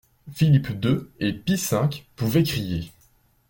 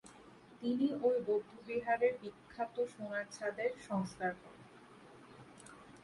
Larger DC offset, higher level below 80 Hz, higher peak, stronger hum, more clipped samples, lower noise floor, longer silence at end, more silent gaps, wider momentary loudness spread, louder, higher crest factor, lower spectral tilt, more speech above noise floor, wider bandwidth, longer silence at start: neither; first, -50 dBFS vs -76 dBFS; first, -8 dBFS vs -20 dBFS; neither; neither; about the same, -60 dBFS vs -59 dBFS; first, 0.6 s vs 0.05 s; neither; second, 11 LU vs 24 LU; first, -24 LUFS vs -38 LUFS; about the same, 16 dB vs 18 dB; about the same, -6 dB/octave vs -6 dB/octave; first, 38 dB vs 22 dB; first, 17 kHz vs 11.5 kHz; first, 0.25 s vs 0.05 s